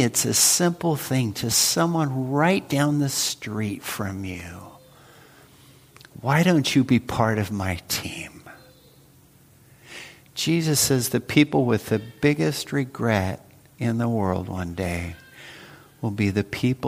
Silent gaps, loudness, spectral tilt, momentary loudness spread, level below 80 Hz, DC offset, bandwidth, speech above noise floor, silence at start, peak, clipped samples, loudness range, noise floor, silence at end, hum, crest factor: none; -23 LUFS; -4 dB/octave; 17 LU; -54 dBFS; under 0.1%; 15.5 kHz; 31 dB; 0 s; -4 dBFS; under 0.1%; 7 LU; -54 dBFS; 0 s; none; 20 dB